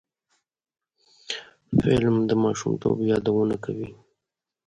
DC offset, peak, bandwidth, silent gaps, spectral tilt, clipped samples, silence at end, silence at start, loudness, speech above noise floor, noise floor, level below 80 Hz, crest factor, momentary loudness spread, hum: under 0.1%; -6 dBFS; 10.5 kHz; none; -6.5 dB/octave; under 0.1%; 0.75 s; 1.3 s; -24 LUFS; 64 dB; -86 dBFS; -52 dBFS; 20 dB; 13 LU; none